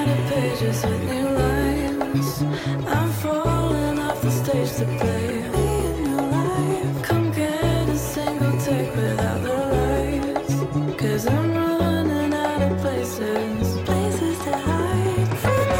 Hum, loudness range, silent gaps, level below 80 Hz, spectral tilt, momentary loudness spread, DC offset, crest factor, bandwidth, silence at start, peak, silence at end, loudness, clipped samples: none; 1 LU; none; -36 dBFS; -6.5 dB/octave; 3 LU; under 0.1%; 12 dB; 17 kHz; 0 s; -10 dBFS; 0 s; -22 LUFS; under 0.1%